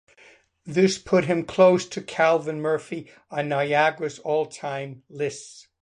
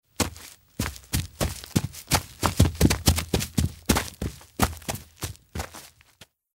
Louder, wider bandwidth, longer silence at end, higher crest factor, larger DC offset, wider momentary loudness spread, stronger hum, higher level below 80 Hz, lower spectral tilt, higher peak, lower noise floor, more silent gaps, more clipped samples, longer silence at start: first, -23 LUFS vs -27 LUFS; second, 10.5 kHz vs 16.5 kHz; second, 0.2 s vs 0.7 s; second, 18 dB vs 24 dB; neither; about the same, 15 LU vs 15 LU; neither; second, -64 dBFS vs -36 dBFS; about the same, -5 dB/octave vs -4 dB/octave; about the same, -6 dBFS vs -4 dBFS; about the same, -55 dBFS vs -56 dBFS; neither; neither; first, 0.65 s vs 0.2 s